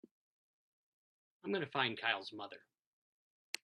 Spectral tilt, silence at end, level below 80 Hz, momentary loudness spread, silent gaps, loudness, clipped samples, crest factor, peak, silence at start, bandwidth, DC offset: -3.5 dB/octave; 1.05 s; -90 dBFS; 16 LU; none; -38 LUFS; under 0.1%; 26 dB; -18 dBFS; 1.45 s; 11 kHz; under 0.1%